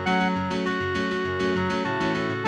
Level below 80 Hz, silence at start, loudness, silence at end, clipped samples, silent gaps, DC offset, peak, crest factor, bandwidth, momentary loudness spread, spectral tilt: -52 dBFS; 0 s; -25 LUFS; 0 s; under 0.1%; none; under 0.1%; -10 dBFS; 16 dB; 10 kHz; 2 LU; -6 dB/octave